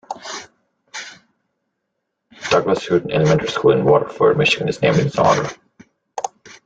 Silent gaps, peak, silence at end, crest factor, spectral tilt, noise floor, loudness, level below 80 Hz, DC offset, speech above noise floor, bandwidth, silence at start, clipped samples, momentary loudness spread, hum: none; -2 dBFS; 0.4 s; 18 dB; -5.5 dB/octave; -76 dBFS; -16 LUFS; -52 dBFS; under 0.1%; 59 dB; 9 kHz; 0.1 s; under 0.1%; 17 LU; none